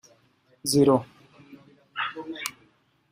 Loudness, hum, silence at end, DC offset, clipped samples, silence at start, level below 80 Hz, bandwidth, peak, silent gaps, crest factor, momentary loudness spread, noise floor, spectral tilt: -26 LUFS; none; 0.6 s; under 0.1%; under 0.1%; 0.65 s; -64 dBFS; 15.5 kHz; -6 dBFS; none; 22 dB; 17 LU; -63 dBFS; -4.5 dB/octave